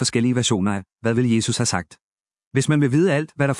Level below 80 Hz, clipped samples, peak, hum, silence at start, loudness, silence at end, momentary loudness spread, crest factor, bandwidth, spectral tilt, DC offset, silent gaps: -60 dBFS; under 0.1%; -4 dBFS; none; 0 s; -20 LUFS; 0 s; 8 LU; 16 dB; 12 kHz; -5 dB/octave; under 0.1%; 2.02-2.24 s, 2.46-2.51 s